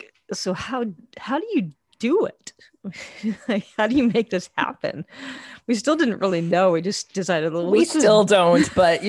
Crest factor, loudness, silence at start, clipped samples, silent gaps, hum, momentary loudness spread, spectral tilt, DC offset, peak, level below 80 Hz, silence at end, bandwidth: 18 dB; -21 LUFS; 0.3 s; under 0.1%; none; none; 19 LU; -5 dB/octave; under 0.1%; -4 dBFS; -56 dBFS; 0 s; 12.5 kHz